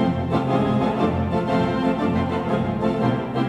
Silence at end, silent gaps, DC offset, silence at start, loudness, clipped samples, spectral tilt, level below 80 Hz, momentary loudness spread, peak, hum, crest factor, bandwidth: 0 s; none; under 0.1%; 0 s; -22 LUFS; under 0.1%; -8.5 dB/octave; -42 dBFS; 2 LU; -8 dBFS; none; 14 dB; 10 kHz